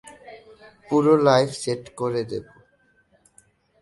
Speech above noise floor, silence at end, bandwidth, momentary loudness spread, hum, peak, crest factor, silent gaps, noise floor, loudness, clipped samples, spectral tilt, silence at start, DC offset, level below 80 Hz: 42 dB; 1.4 s; 11.5 kHz; 16 LU; none; -2 dBFS; 22 dB; none; -62 dBFS; -21 LUFS; under 0.1%; -6 dB/octave; 0.05 s; under 0.1%; -62 dBFS